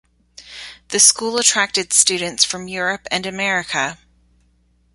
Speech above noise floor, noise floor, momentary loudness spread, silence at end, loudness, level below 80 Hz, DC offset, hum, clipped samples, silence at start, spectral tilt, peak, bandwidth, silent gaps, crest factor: 41 dB; -59 dBFS; 17 LU; 1 s; -16 LUFS; -58 dBFS; under 0.1%; none; under 0.1%; 0.4 s; -0.5 dB/octave; 0 dBFS; 16 kHz; none; 20 dB